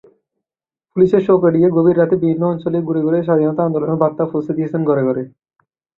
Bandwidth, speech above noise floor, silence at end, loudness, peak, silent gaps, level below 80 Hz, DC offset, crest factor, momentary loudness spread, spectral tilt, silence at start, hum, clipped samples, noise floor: 4.1 kHz; 74 dB; 0.7 s; -16 LUFS; 0 dBFS; none; -56 dBFS; under 0.1%; 16 dB; 7 LU; -11 dB/octave; 0.95 s; none; under 0.1%; -88 dBFS